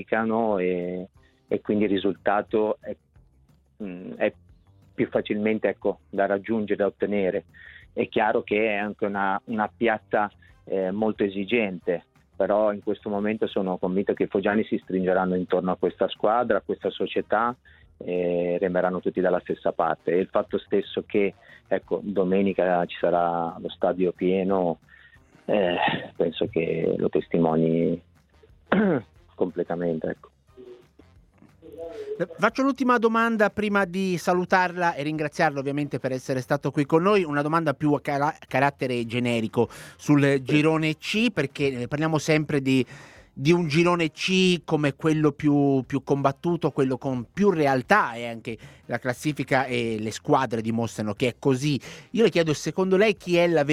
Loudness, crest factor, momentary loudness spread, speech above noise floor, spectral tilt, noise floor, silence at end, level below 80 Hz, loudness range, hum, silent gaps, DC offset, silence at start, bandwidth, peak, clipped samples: -25 LUFS; 22 dB; 9 LU; 36 dB; -6 dB/octave; -60 dBFS; 0 s; -60 dBFS; 5 LU; none; none; under 0.1%; 0 s; 14.5 kHz; -4 dBFS; under 0.1%